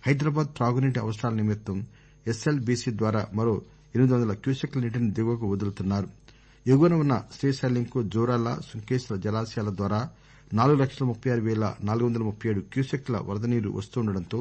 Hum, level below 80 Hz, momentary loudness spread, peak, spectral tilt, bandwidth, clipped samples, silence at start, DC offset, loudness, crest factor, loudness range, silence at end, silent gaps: none; -56 dBFS; 8 LU; -10 dBFS; -7.5 dB/octave; 8.6 kHz; under 0.1%; 0 s; under 0.1%; -27 LUFS; 16 dB; 2 LU; 0 s; none